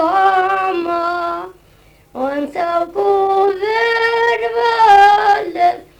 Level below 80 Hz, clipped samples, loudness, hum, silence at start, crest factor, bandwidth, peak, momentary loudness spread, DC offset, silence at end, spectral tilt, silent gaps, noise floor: -52 dBFS; under 0.1%; -14 LUFS; none; 0 s; 14 dB; 13 kHz; -2 dBFS; 12 LU; under 0.1%; 0.15 s; -3.5 dB/octave; none; -48 dBFS